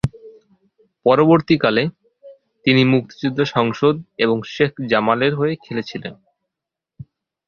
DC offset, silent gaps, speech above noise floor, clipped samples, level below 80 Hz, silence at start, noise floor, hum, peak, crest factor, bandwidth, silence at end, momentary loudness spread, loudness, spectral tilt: under 0.1%; none; 68 dB; under 0.1%; -50 dBFS; 0.05 s; -85 dBFS; none; 0 dBFS; 18 dB; 7.2 kHz; 1.35 s; 12 LU; -18 LUFS; -7.5 dB/octave